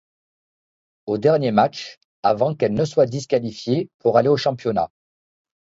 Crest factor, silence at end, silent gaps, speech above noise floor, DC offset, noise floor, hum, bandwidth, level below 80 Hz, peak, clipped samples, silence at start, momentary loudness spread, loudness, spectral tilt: 20 dB; 0.9 s; 1.97-2.23 s, 3.94-3.99 s; over 71 dB; under 0.1%; under -90 dBFS; none; 7.8 kHz; -58 dBFS; -2 dBFS; under 0.1%; 1.05 s; 10 LU; -20 LUFS; -6.5 dB/octave